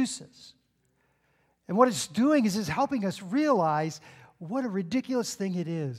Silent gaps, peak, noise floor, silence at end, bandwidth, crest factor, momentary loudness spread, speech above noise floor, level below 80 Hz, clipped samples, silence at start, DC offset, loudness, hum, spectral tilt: none; -8 dBFS; -71 dBFS; 0 s; 15 kHz; 22 dB; 10 LU; 44 dB; -68 dBFS; under 0.1%; 0 s; under 0.1%; -27 LUFS; none; -5.5 dB/octave